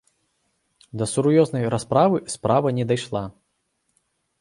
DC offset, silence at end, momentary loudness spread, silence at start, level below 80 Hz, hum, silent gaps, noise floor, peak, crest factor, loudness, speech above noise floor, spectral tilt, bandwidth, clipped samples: under 0.1%; 1.1 s; 11 LU; 0.95 s; -56 dBFS; none; none; -72 dBFS; -4 dBFS; 20 dB; -21 LUFS; 52 dB; -6 dB/octave; 11.5 kHz; under 0.1%